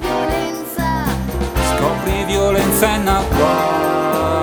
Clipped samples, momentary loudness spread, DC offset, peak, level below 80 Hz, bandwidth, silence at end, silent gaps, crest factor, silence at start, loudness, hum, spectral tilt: under 0.1%; 6 LU; under 0.1%; 0 dBFS; -26 dBFS; over 20 kHz; 0 s; none; 16 dB; 0 s; -17 LUFS; none; -5 dB/octave